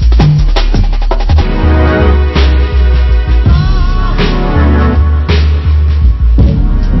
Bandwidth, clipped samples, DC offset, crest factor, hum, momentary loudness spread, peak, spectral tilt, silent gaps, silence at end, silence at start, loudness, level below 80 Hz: 6 kHz; 0.2%; under 0.1%; 6 dB; none; 4 LU; 0 dBFS; -8 dB/octave; none; 0 s; 0 s; -10 LUFS; -8 dBFS